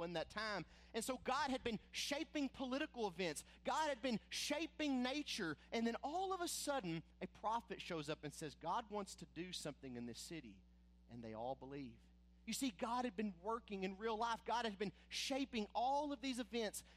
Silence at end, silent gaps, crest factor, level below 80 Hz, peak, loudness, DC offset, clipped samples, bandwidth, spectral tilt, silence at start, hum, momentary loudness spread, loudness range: 0 s; none; 16 dB; -68 dBFS; -28 dBFS; -44 LUFS; under 0.1%; under 0.1%; 15.5 kHz; -3.5 dB/octave; 0 s; none; 10 LU; 7 LU